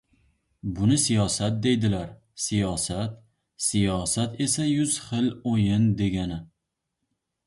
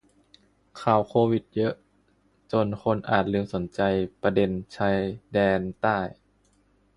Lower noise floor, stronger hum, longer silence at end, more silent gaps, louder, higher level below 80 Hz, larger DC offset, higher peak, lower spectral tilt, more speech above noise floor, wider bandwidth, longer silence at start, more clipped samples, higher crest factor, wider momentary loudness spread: first, -82 dBFS vs -65 dBFS; second, none vs 50 Hz at -45 dBFS; first, 1 s vs 0.85 s; neither; about the same, -25 LUFS vs -26 LUFS; about the same, -48 dBFS vs -52 dBFS; neither; second, -10 dBFS vs -6 dBFS; second, -5 dB/octave vs -8 dB/octave; first, 57 dB vs 40 dB; about the same, 11.5 kHz vs 11 kHz; about the same, 0.65 s vs 0.75 s; neither; second, 16 dB vs 22 dB; first, 10 LU vs 6 LU